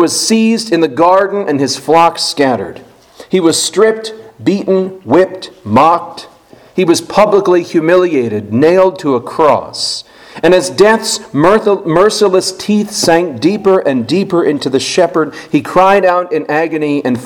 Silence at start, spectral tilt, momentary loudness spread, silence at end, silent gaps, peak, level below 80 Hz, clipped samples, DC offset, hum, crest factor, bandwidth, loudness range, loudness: 0 s; -4.5 dB/octave; 7 LU; 0 s; none; 0 dBFS; -48 dBFS; 0.5%; under 0.1%; none; 12 dB; 18 kHz; 2 LU; -11 LUFS